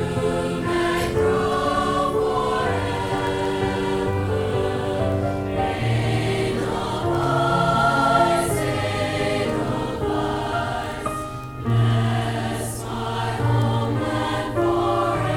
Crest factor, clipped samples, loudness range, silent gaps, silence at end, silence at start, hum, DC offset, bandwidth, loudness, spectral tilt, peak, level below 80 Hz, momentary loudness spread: 16 dB; under 0.1%; 3 LU; none; 0 s; 0 s; none; under 0.1%; 16 kHz; -22 LUFS; -6 dB/octave; -6 dBFS; -40 dBFS; 6 LU